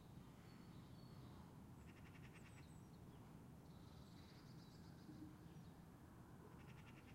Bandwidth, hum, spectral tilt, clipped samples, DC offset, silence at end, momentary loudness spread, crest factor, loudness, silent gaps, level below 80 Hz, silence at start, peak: 16 kHz; none; -6 dB/octave; under 0.1%; under 0.1%; 0 s; 2 LU; 12 dB; -62 LUFS; none; -72 dBFS; 0 s; -48 dBFS